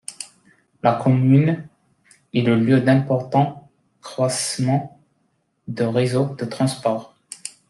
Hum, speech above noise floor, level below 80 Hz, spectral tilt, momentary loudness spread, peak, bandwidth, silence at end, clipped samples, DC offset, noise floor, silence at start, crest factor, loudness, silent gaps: none; 49 dB; -62 dBFS; -6.5 dB/octave; 18 LU; -2 dBFS; 12.5 kHz; 0.2 s; under 0.1%; under 0.1%; -68 dBFS; 0.1 s; 18 dB; -20 LUFS; none